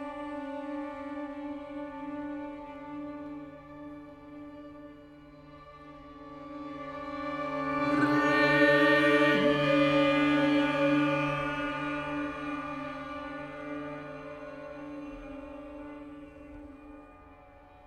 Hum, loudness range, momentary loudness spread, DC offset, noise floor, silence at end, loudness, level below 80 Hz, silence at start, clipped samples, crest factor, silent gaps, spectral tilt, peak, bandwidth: none; 21 LU; 24 LU; under 0.1%; -54 dBFS; 0 s; -29 LUFS; -60 dBFS; 0 s; under 0.1%; 20 dB; none; -6 dB/octave; -10 dBFS; 10.5 kHz